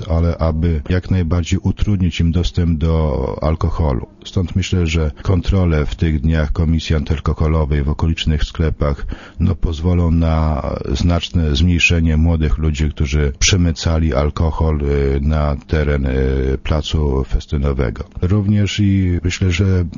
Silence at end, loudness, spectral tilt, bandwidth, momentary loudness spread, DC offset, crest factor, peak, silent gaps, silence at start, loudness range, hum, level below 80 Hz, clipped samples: 0 s; -17 LUFS; -6 dB/octave; 7.4 kHz; 5 LU; under 0.1%; 14 dB; -2 dBFS; none; 0 s; 3 LU; none; -22 dBFS; under 0.1%